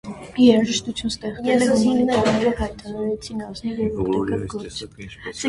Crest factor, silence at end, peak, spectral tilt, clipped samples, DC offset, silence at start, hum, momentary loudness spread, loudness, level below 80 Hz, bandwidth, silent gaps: 20 dB; 0 s; -2 dBFS; -5 dB/octave; under 0.1%; under 0.1%; 0.05 s; none; 15 LU; -21 LUFS; -44 dBFS; 11.5 kHz; none